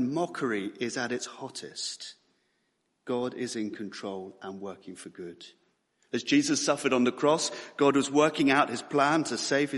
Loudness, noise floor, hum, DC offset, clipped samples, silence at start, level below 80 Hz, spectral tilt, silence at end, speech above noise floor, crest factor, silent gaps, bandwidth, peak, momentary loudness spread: -28 LUFS; -76 dBFS; none; under 0.1%; under 0.1%; 0 s; -74 dBFS; -3.5 dB/octave; 0 s; 47 dB; 22 dB; none; 11.5 kHz; -8 dBFS; 18 LU